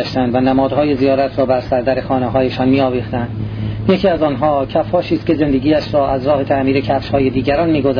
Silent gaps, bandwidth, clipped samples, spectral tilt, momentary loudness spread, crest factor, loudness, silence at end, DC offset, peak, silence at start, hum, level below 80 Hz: none; 5.4 kHz; under 0.1%; -9 dB/octave; 3 LU; 12 dB; -15 LUFS; 0 s; under 0.1%; -2 dBFS; 0 s; none; -36 dBFS